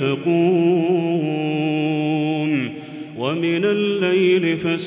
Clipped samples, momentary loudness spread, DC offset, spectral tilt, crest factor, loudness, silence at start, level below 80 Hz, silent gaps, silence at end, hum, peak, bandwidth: under 0.1%; 8 LU; under 0.1%; -11 dB/octave; 12 dB; -19 LUFS; 0 s; -66 dBFS; none; 0 s; none; -6 dBFS; 4 kHz